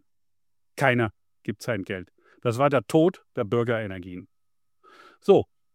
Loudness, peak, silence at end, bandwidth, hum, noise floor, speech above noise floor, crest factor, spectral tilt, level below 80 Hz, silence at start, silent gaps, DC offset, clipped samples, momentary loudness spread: -25 LUFS; -6 dBFS; 0.3 s; 16 kHz; none; -87 dBFS; 63 dB; 20 dB; -6.5 dB/octave; -64 dBFS; 0.75 s; none; under 0.1%; under 0.1%; 17 LU